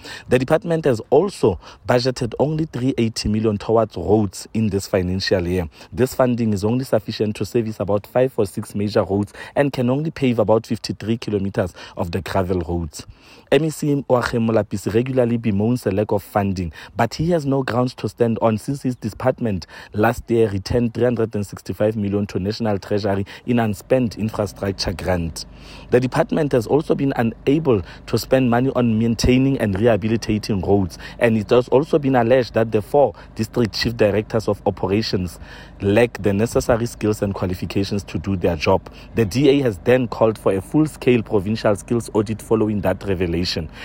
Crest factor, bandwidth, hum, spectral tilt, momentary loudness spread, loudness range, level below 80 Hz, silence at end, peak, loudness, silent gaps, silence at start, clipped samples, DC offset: 16 dB; 16.5 kHz; none; -6.5 dB/octave; 7 LU; 3 LU; -40 dBFS; 0 s; -4 dBFS; -20 LUFS; none; 0.05 s; under 0.1%; under 0.1%